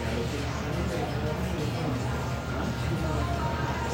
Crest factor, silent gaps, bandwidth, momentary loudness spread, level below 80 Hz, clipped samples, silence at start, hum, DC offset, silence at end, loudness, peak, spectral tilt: 12 dB; none; 16 kHz; 2 LU; -38 dBFS; under 0.1%; 0 s; none; under 0.1%; 0 s; -30 LUFS; -16 dBFS; -6 dB/octave